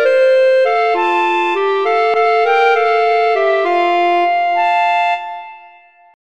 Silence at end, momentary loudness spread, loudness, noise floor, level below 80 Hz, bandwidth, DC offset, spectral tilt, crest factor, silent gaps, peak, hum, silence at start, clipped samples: 0.6 s; 4 LU; -13 LUFS; -44 dBFS; -66 dBFS; 8.4 kHz; 0.6%; -2 dB/octave; 12 dB; none; -2 dBFS; none; 0 s; under 0.1%